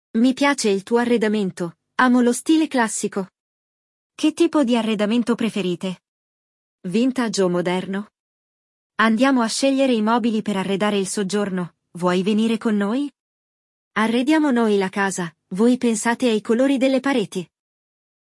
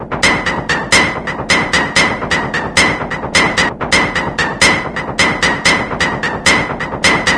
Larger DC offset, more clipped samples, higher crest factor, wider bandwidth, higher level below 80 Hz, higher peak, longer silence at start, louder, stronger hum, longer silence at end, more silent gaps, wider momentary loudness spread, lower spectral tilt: neither; neither; about the same, 16 dB vs 14 dB; about the same, 12 kHz vs 11 kHz; second, -70 dBFS vs -34 dBFS; second, -4 dBFS vs 0 dBFS; first, 0.15 s vs 0 s; second, -20 LUFS vs -13 LUFS; neither; first, 0.8 s vs 0 s; first, 3.40-4.10 s, 6.08-6.78 s, 8.20-8.90 s, 13.20-13.91 s vs none; first, 11 LU vs 5 LU; first, -4.5 dB/octave vs -2.5 dB/octave